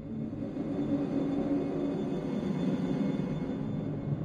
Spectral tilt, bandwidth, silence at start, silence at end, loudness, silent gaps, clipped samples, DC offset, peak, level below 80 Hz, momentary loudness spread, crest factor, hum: -9 dB/octave; 9 kHz; 0 s; 0 s; -33 LUFS; none; under 0.1%; under 0.1%; -20 dBFS; -56 dBFS; 4 LU; 12 dB; none